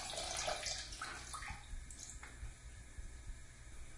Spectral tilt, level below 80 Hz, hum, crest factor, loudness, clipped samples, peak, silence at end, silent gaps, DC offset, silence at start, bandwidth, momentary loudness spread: -1.5 dB/octave; -54 dBFS; 60 Hz at -60 dBFS; 20 dB; -45 LUFS; under 0.1%; -26 dBFS; 0 s; none; under 0.1%; 0 s; 11.5 kHz; 16 LU